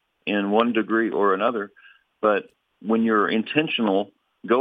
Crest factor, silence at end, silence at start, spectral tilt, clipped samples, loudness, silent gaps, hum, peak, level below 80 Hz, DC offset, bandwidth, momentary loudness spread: 20 dB; 0 s; 0.25 s; -8 dB/octave; under 0.1%; -22 LUFS; none; none; -2 dBFS; -78 dBFS; under 0.1%; 4.8 kHz; 11 LU